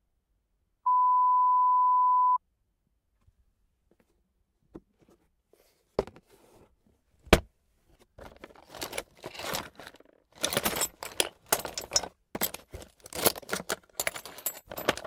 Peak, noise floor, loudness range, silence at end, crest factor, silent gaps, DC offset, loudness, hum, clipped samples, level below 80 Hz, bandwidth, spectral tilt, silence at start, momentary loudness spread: -4 dBFS; -76 dBFS; 18 LU; 0.05 s; 28 dB; none; under 0.1%; -28 LUFS; none; under 0.1%; -48 dBFS; 18 kHz; -2.5 dB/octave; 0.85 s; 21 LU